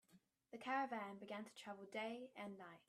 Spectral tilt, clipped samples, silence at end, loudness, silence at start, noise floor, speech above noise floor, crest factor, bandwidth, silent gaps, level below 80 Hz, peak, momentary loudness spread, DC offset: -4.5 dB/octave; under 0.1%; 0.1 s; -49 LUFS; 0.1 s; -75 dBFS; 26 dB; 20 dB; 13.5 kHz; none; under -90 dBFS; -30 dBFS; 11 LU; under 0.1%